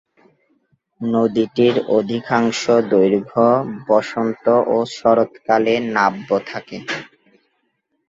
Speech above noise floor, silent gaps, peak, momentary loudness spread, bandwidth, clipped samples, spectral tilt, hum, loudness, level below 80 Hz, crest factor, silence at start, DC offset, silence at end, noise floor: 52 dB; none; -2 dBFS; 10 LU; 7.8 kHz; under 0.1%; -5.5 dB/octave; none; -18 LUFS; -62 dBFS; 16 dB; 1 s; under 0.1%; 1.05 s; -69 dBFS